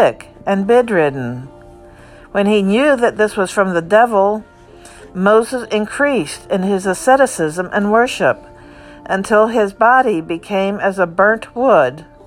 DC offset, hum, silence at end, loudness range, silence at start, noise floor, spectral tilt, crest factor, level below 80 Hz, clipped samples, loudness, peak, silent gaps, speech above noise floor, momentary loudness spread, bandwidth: under 0.1%; none; 0.25 s; 2 LU; 0 s; -40 dBFS; -5 dB/octave; 14 dB; -48 dBFS; under 0.1%; -15 LUFS; 0 dBFS; none; 26 dB; 9 LU; 15 kHz